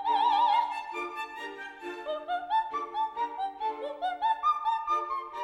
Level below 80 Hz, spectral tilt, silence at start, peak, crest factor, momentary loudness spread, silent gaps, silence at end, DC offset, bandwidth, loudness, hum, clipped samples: -70 dBFS; -2 dB/octave; 0 s; -16 dBFS; 16 dB; 13 LU; none; 0 s; under 0.1%; 11 kHz; -30 LUFS; none; under 0.1%